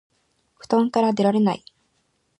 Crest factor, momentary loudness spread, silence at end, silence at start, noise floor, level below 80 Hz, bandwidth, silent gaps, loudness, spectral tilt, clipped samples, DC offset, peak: 18 dB; 4 LU; 0.85 s; 0.7 s; -69 dBFS; -70 dBFS; 11 kHz; none; -21 LUFS; -7 dB/octave; under 0.1%; under 0.1%; -6 dBFS